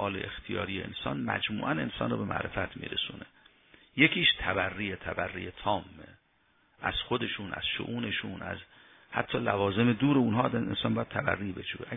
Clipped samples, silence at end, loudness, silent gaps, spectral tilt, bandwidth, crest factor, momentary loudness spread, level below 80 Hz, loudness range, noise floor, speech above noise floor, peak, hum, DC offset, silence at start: under 0.1%; 0 s; -30 LUFS; none; -8.5 dB/octave; 3.9 kHz; 24 dB; 12 LU; -56 dBFS; 5 LU; -69 dBFS; 38 dB; -8 dBFS; none; under 0.1%; 0 s